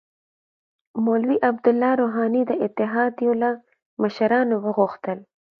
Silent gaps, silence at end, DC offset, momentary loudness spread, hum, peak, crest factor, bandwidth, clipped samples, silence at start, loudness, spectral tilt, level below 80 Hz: 3.82-3.97 s; 0.35 s; under 0.1%; 12 LU; none; -6 dBFS; 18 dB; 5.6 kHz; under 0.1%; 0.95 s; -22 LUFS; -8.5 dB/octave; -74 dBFS